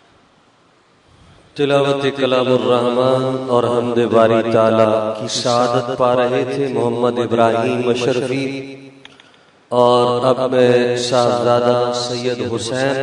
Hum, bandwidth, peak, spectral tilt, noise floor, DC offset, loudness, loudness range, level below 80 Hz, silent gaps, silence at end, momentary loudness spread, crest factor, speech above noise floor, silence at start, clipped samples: none; 11 kHz; 0 dBFS; -5.5 dB/octave; -53 dBFS; under 0.1%; -16 LUFS; 3 LU; -60 dBFS; none; 0 s; 7 LU; 16 dB; 38 dB; 1.55 s; under 0.1%